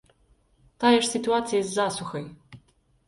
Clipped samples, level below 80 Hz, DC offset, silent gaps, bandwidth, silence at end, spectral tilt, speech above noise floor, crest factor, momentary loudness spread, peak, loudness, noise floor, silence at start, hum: under 0.1%; -62 dBFS; under 0.1%; none; 11.5 kHz; 0.5 s; -3.5 dB/octave; 39 dB; 20 dB; 15 LU; -6 dBFS; -24 LUFS; -63 dBFS; 0.8 s; none